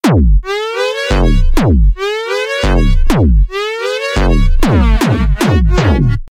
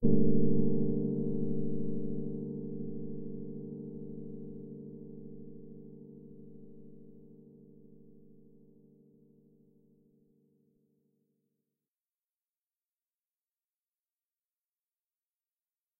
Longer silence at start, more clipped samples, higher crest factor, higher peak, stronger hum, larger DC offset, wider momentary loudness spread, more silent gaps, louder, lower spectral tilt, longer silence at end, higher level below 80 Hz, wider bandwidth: about the same, 0.05 s vs 0 s; neither; second, 10 dB vs 20 dB; first, 0 dBFS vs -12 dBFS; neither; neither; second, 5 LU vs 26 LU; neither; first, -13 LUFS vs -35 LUFS; second, -6.5 dB/octave vs -12 dB/octave; about the same, 0.05 s vs 0 s; first, -12 dBFS vs -58 dBFS; first, 15 kHz vs 1.2 kHz